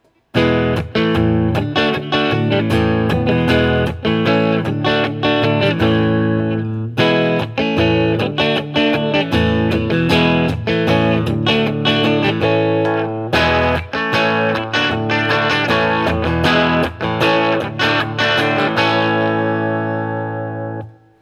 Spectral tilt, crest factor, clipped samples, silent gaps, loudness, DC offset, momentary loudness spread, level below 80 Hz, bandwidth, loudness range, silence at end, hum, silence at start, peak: -6.5 dB/octave; 16 dB; under 0.1%; none; -16 LUFS; under 0.1%; 4 LU; -42 dBFS; 14.5 kHz; 1 LU; 0.3 s; none; 0.35 s; 0 dBFS